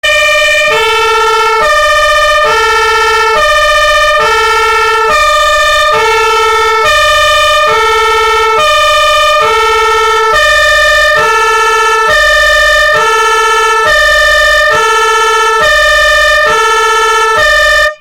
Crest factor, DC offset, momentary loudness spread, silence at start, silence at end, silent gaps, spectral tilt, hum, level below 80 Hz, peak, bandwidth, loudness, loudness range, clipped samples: 4 dB; under 0.1%; 2 LU; 0.05 s; 0.05 s; none; 0 dB/octave; none; -30 dBFS; -2 dBFS; 17 kHz; -6 LUFS; 1 LU; under 0.1%